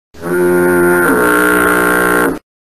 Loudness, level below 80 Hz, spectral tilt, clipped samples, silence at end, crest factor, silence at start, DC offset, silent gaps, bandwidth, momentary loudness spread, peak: -11 LUFS; -40 dBFS; -5 dB/octave; under 0.1%; 0.25 s; 12 dB; 0.15 s; 1%; none; 15 kHz; 5 LU; 0 dBFS